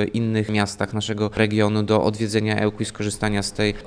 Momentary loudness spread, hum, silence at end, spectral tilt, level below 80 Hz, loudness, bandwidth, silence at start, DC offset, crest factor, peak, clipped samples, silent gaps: 5 LU; none; 0 s; -5.5 dB/octave; -44 dBFS; -22 LUFS; 10.5 kHz; 0 s; under 0.1%; 18 dB; -4 dBFS; under 0.1%; none